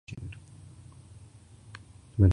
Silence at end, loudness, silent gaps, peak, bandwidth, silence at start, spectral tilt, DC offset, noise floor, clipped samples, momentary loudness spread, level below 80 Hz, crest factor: 0 s; -32 LUFS; none; -8 dBFS; 10 kHz; 0.1 s; -9 dB/octave; under 0.1%; -52 dBFS; under 0.1%; 13 LU; -40 dBFS; 22 dB